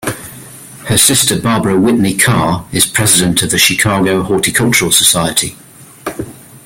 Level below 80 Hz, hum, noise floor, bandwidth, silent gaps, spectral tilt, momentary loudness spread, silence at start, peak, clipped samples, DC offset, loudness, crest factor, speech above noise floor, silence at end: -40 dBFS; none; -33 dBFS; over 20 kHz; none; -3 dB/octave; 19 LU; 0 s; 0 dBFS; under 0.1%; under 0.1%; -10 LUFS; 12 dB; 21 dB; 0.1 s